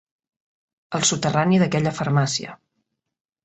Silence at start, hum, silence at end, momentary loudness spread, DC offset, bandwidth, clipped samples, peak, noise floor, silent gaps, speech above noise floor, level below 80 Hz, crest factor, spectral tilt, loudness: 0.9 s; none; 0.9 s; 10 LU; under 0.1%; 8.2 kHz; under 0.1%; -4 dBFS; -76 dBFS; none; 55 dB; -58 dBFS; 18 dB; -4.5 dB/octave; -21 LUFS